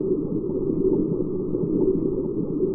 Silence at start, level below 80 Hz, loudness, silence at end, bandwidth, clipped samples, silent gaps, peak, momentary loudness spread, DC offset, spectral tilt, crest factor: 0 s; -42 dBFS; -24 LUFS; 0 s; 1.4 kHz; under 0.1%; none; -10 dBFS; 4 LU; under 0.1%; -17.5 dB/octave; 12 dB